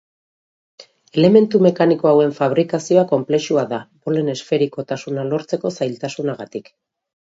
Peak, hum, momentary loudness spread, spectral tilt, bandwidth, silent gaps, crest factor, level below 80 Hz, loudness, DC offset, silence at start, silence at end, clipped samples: 0 dBFS; none; 12 LU; -6.5 dB/octave; 8 kHz; none; 18 dB; -66 dBFS; -18 LUFS; under 0.1%; 0.8 s; 0.6 s; under 0.1%